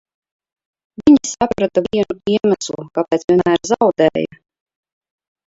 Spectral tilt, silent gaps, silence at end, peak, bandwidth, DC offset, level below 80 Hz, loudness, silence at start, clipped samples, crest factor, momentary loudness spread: -5 dB/octave; 3.24-3.28 s; 1.25 s; 0 dBFS; 7.8 kHz; under 0.1%; -50 dBFS; -16 LUFS; 1 s; under 0.1%; 18 dB; 9 LU